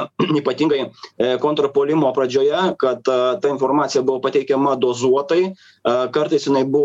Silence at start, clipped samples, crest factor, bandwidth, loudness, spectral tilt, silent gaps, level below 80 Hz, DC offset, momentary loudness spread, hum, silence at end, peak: 0 s; under 0.1%; 14 dB; 8 kHz; -18 LUFS; -5.5 dB/octave; none; -64 dBFS; under 0.1%; 3 LU; none; 0 s; -4 dBFS